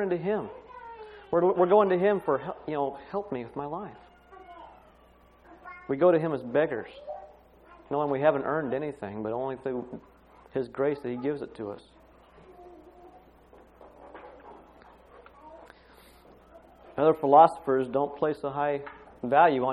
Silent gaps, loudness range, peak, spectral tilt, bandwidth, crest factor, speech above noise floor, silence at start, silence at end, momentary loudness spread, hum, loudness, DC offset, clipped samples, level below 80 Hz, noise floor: none; 12 LU; -6 dBFS; -8.5 dB/octave; 10.5 kHz; 24 dB; 31 dB; 0 s; 0 s; 24 LU; none; -27 LUFS; under 0.1%; under 0.1%; -62 dBFS; -58 dBFS